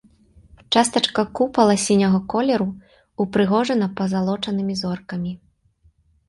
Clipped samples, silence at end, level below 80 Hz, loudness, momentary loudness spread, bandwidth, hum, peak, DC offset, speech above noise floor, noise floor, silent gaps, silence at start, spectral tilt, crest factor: under 0.1%; 0.95 s; -54 dBFS; -20 LUFS; 11 LU; 11.5 kHz; none; -2 dBFS; under 0.1%; 40 dB; -59 dBFS; none; 0.7 s; -5 dB/octave; 20 dB